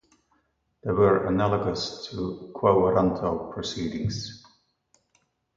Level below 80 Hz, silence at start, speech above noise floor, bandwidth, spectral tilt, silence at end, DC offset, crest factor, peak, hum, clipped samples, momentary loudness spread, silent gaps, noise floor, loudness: -50 dBFS; 0.85 s; 46 dB; 7.6 kHz; -6.5 dB/octave; 1.2 s; under 0.1%; 20 dB; -6 dBFS; none; under 0.1%; 12 LU; none; -71 dBFS; -25 LUFS